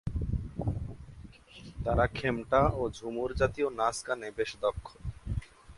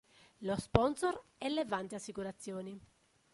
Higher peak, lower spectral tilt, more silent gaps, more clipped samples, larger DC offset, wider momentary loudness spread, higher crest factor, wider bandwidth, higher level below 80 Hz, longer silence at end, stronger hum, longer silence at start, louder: about the same, -12 dBFS vs -10 dBFS; about the same, -6 dB/octave vs -5.5 dB/octave; neither; neither; neither; first, 19 LU vs 13 LU; second, 20 dB vs 28 dB; about the same, 11.5 kHz vs 11.5 kHz; first, -42 dBFS vs -56 dBFS; second, 0 s vs 0.5 s; neither; second, 0.05 s vs 0.4 s; first, -32 LUFS vs -37 LUFS